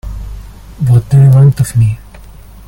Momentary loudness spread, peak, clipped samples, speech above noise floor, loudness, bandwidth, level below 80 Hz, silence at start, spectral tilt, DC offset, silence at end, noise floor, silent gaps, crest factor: 21 LU; 0 dBFS; under 0.1%; 26 dB; -9 LUFS; 16 kHz; -28 dBFS; 0.05 s; -8 dB/octave; under 0.1%; 0.65 s; -33 dBFS; none; 10 dB